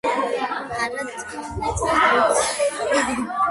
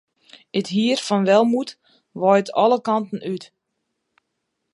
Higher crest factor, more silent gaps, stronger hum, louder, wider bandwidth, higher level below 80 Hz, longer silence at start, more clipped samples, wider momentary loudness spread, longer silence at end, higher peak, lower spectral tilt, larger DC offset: about the same, 18 dB vs 18 dB; neither; neither; about the same, -21 LUFS vs -20 LUFS; about the same, 12 kHz vs 11.5 kHz; first, -44 dBFS vs -74 dBFS; second, 0.05 s vs 0.55 s; neither; about the same, 12 LU vs 14 LU; second, 0 s vs 1.3 s; about the same, -4 dBFS vs -2 dBFS; second, -3 dB/octave vs -5.5 dB/octave; neither